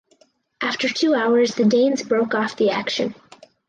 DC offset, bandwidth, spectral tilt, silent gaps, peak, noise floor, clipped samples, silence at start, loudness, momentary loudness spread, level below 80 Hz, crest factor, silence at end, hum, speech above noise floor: under 0.1%; 9.2 kHz; -4.5 dB/octave; none; -8 dBFS; -59 dBFS; under 0.1%; 0.6 s; -20 LUFS; 8 LU; -68 dBFS; 12 dB; 0.55 s; none; 40 dB